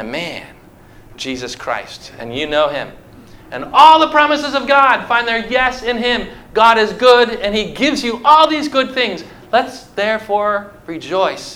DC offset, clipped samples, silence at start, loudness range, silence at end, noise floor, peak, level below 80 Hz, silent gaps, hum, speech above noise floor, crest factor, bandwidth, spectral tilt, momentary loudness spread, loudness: under 0.1%; 0.2%; 0 s; 7 LU; 0 s; -42 dBFS; 0 dBFS; -44 dBFS; none; none; 27 dB; 16 dB; 16.5 kHz; -3.5 dB/octave; 16 LU; -14 LUFS